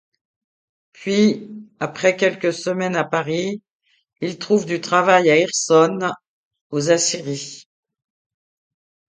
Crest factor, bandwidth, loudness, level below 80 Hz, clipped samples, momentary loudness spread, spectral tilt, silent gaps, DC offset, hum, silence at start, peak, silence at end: 20 dB; 9.6 kHz; -19 LUFS; -68 dBFS; under 0.1%; 14 LU; -4 dB/octave; 3.70-3.80 s, 6.28-6.51 s, 6.61-6.70 s; under 0.1%; none; 1 s; 0 dBFS; 1.5 s